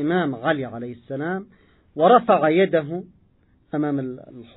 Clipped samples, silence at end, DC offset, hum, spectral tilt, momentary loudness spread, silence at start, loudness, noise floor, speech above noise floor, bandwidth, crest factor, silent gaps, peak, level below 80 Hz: under 0.1%; 0.15 s; under 0.1%; none; -11 dB/octave; 17 LU; 0 s; -21 LUFS; -59 dBFS; 38 dB; 4.1 kHz; 20 dB; none; -2 dBFS; -64 dBFS